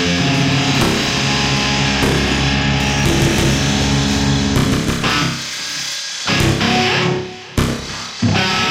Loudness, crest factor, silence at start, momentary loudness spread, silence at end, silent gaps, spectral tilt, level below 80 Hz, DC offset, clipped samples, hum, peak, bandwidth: -16 LUFS; 14 dB; 0 s; 6 LU; 0 s; none; -4 dB/octave; -28 dBFS; under 0.1%; under 0.1%; none; -2 dBFS; 16 kHz